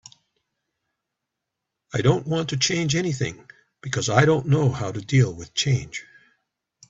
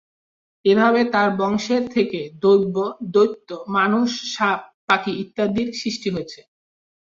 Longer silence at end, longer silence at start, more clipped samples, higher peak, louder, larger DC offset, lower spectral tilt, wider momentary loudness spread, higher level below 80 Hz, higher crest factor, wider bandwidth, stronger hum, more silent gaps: first, 0.85 s vs 0.65 s; first, 1.95 s vs 0.65 s; neither; first, 0 dBFS vs -4 dBFS; about the same, -22 LUFS vs -20 LUFS; neither; about the same, -5 dB/octave vs -5 dB/octave; about the same, 11 LU vs 9 LU; first, -54 dBFS vs -60 dBFS; first, 24 dB vs 18 dB; about the same, 8 kHz vs 7.6 kHz; neither; second, none vs 4.74-4.88 s